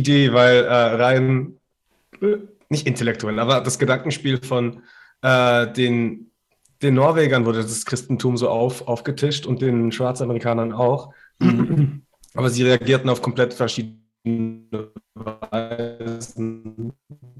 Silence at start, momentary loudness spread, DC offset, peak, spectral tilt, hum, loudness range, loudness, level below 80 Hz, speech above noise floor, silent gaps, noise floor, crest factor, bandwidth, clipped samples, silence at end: 0 s; 16 LU; under 0.1%; -2 dBFS; -5.5 dB/octave; none; 5 LU; -20 LUFS; -58 dBFS; 48 dB; none; -67 dBFS; 18 dB; 12.5 kHz; under 0.1%; 0.1 s